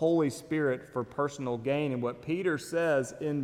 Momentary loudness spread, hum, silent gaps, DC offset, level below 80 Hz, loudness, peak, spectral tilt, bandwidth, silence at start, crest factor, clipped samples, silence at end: 6 LU; none; none; under 0.1%; -66 dBFS; -31 LUFS; -16 dBFS; -6 dB/octave; 15.5 kHz; 0 s; 14 dB; under 0.1%; 0 s